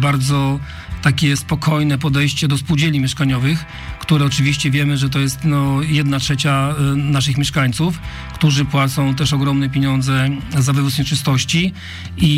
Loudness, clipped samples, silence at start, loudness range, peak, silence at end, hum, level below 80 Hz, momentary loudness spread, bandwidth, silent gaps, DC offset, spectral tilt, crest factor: -17 LUFS; under 0.1%; 0 s; 1 LU; -4 dBFS; 0 s; none; -36 dBFS; 5 LU; 15.5 kHz; none; under 0.1%; -5 dB/octave; 12 dB